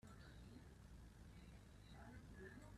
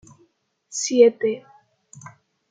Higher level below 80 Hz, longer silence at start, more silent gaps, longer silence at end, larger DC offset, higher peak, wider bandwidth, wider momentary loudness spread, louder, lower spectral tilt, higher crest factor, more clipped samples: first, -66 dBFS vs -74 dBFS; second, 0.05 s vs 0.7 s; neither; second, 0 s vs 0.45 s; neither; second, -46 dBFS vs -2 dBFS; first, 13.5 kHz vs 9.4 kHz; second, 4 LU vs 16 LU; second, -62 LUFS vs -19 LUFS; first, -6 dB/octave vs -3 dB/octave; second, 14 dB vs 20 dB; neither